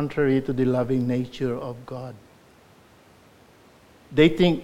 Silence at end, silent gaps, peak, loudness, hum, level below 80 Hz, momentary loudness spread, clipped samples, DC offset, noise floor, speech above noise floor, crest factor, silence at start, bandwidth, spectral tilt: 0 s; none; -4 dBFS; -23 LUFS; none; -50 dBFS; 18 LU; under 0.1%; under 0.1%; -54 dBFS; 31 dB; 20 dB; 0 s; 13.5 kHz; -7.5 dB/octave